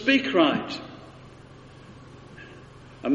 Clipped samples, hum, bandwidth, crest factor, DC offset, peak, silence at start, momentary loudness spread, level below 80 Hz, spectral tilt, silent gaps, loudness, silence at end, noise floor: under 0.1%; none; 8.2 kHz; 20 dB; under 0.1%; -6 dBFS; 0 s; 26 LU; -60 dBFS; -5 dB/octave; none; -24 LUFS; 0 s; -47 dBFS